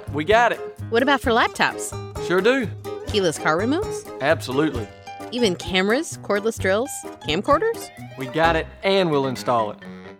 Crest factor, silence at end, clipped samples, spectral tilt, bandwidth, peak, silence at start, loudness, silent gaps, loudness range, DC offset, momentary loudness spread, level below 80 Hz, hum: 20 dB; 0.05 s; under 0.1%; -4.5 dB/octave; 17 kHz; -2 dBFS; 0 s; -21 LUFS; none; 2 LU; under 0.1%; 12 LU; -44 dBFS; none